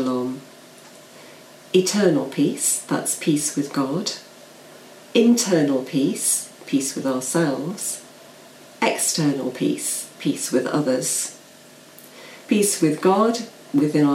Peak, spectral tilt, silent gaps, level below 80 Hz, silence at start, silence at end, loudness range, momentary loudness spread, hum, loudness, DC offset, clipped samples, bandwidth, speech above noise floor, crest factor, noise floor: -4 dBFS; -4 dB/octave; none; -72 dBFS; 0 s; 0 s; 3 LU; 9 LU; none; -21 LUFS; under 0.1%; under 0.1%; 16.5 kHz; 26 dB; 18 dB; -46 dBFS